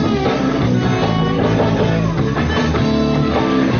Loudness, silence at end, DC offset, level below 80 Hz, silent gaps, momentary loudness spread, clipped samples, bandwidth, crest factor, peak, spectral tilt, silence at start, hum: -16 LUFS; 0 s; 0.4%; -32 dBFS; none; 2 LU; under 0.1%; 6.8 kHz; 12 dB; -4 dBFS; -6 dB/octave; 0 s; none